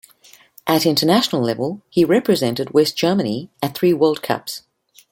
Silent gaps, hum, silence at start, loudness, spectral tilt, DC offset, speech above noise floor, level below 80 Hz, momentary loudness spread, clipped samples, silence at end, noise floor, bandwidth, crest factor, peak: none; none; 0.65 s; -18 LUFS; -5 dB/octave; under 0.1%; 32 dB; -60 dBFS; 9 LU; under 0.1%; 0.5 s; -50 dBFS; 17 kHz; 18 dB; -2 dBFS